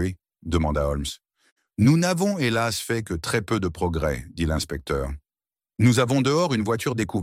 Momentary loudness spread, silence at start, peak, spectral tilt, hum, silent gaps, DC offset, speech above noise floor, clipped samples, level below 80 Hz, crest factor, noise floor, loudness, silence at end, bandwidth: 12 LU; 0 s; -6 dBFS; -5.5 dB/octave; none; 1.52-1.56 s; under 0.1%; over 67 dB; under 0.1%; -38 dBFS; 16 dB; under -90 dBFS; -24 LUFS; 0 s; 16.5 kHz